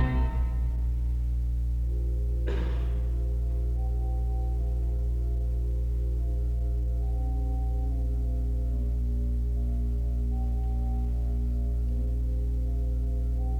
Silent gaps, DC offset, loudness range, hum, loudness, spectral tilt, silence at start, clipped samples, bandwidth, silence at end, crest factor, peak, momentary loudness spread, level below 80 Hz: none; under 0.1%; 0 LU; 60 Hz at -25 dBFS; -30 LUFS; -9 dB/octave; 0 s; under 0.1%; 3.1 kHz; 0 s; 14 dB; -14 dBFS; 0 LU; -28 dBFS